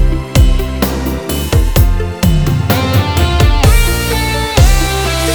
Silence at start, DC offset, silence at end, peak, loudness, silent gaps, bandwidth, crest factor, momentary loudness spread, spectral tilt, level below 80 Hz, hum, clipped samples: 0 s; 0.5%; 0 s; 0 dBFS; -12 LUFS; none; over 20 kHz; 10 dB; 5 LU; -5 dB/octave; -14 dBFS; none; 0.4%